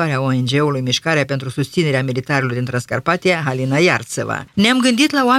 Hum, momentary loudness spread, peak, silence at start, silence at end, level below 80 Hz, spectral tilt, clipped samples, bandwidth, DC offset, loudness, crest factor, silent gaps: none; 8 LU; 0 dBFS; 0 s; 0 s; -56 dBFS; -5 dB/octave; under 0.1%; 15 kHz; under 0.1%; -17 LUFS; 16 dB; none